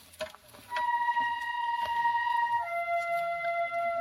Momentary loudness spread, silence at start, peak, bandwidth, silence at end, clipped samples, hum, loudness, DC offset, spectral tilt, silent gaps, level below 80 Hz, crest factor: 7 LU; 0.15 s; -20 dBFS; 16 kHz; 0 s; under 0.1%; none; -30 LUFS; under 0.1%; -2 dB/octave; none; -70 dBFS; 12 dB